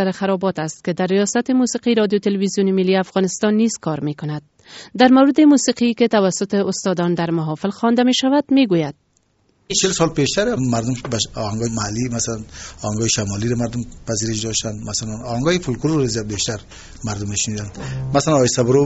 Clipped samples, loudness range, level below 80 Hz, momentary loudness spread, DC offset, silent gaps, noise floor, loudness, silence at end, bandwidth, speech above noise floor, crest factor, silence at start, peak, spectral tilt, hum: under 0.1%; 6 LU; -44 dBFS; 10 LU; under 0.1%; none; -61 dBFS; -18 LUFS; 0 s; 8.2 kHz; 43 dB; 18 dB; 0 s; 0 dBFS; -4.5 dB/octave; none